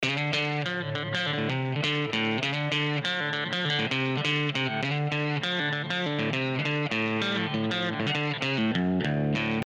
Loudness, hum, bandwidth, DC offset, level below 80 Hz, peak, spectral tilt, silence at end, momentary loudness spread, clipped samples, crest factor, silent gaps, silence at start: -27 LUFS; none; 9.4 kHz; under 0.1%; -62 dBFS; -10 dBFS; -5.5 dB/octave; 0 s; 2 LU; under 0.1%; 16 dB; none; 0 s